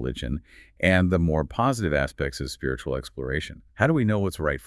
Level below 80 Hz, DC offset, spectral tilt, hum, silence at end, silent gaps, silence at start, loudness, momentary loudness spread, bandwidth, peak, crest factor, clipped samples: -40 dBFS; under 0.1%; -6.5 dB/octave; none; 0 s; none; 0 s; -25 LUFS; 10 LU; 12 kHz; -4 dBFS; 20 dB; under 0.1%